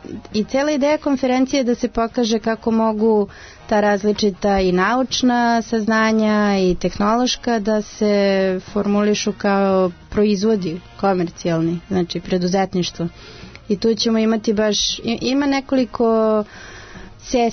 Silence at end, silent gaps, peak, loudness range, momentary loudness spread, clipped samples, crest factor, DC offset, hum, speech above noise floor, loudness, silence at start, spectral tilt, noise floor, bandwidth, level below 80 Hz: 0 s; none; -6 dBFS; 3 LU; 8 LU; under 0.1%; 12 dB; under 0.1%; none; 19 dB; -18 LUFS; 0.05 s; -5 dB/octave; -37 dBFS; 6.6 kHz; -44 dBFS